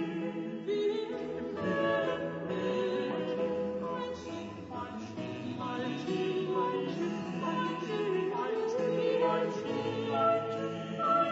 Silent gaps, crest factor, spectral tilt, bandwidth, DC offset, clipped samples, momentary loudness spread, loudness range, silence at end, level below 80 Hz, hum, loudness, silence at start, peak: none; 16 dB; -4.5 dB/octave; 7.6 kHz; under 0.1%; under 0.1%; 10 LU; 5 LU; 0 s; -68 dBFS; none; -33 LUFS; 0 s; -18 dBFS